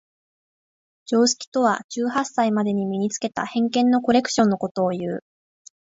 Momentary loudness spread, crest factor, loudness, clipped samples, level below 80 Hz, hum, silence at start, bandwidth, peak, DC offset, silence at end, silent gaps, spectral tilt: 6 LU; 16 dB; -22 LUFS; under 0.1%; -66 dBFS; none; 1.1 s; 8 kHz; -6 dBFS; under 0.1%; 0.75 s; 1.47-1.52 s, 1.84-1.89 s, 4.71-4.75 s; -4.5 dB/octave